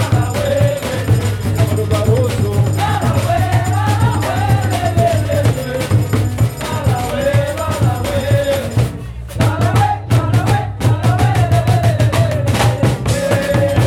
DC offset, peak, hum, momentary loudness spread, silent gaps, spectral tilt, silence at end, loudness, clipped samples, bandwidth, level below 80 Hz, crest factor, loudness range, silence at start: under 0.1%; -2 dBFS; none; 4 LU; none; -6 dB/octave; 0 s; -15 LUFS; under 0.1%; 16 kHz; -32 dBFS; 12 dB; 2 LU; 0 s